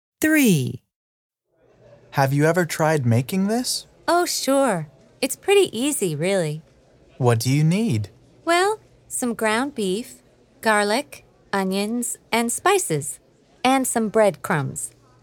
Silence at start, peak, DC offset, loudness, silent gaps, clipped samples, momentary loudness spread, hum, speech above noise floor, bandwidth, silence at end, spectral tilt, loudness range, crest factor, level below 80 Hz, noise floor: 0.2 s; -2 dBFS; under 0.1%; -21 LUFS; 0.96-1.30 s; under 0.1%; 11 LU; none; 39 dB; 19 kHz; 0.35 s; -4.5 dB/octave; 2 LU; 20 dB; -62 dBFS; -60 dBFS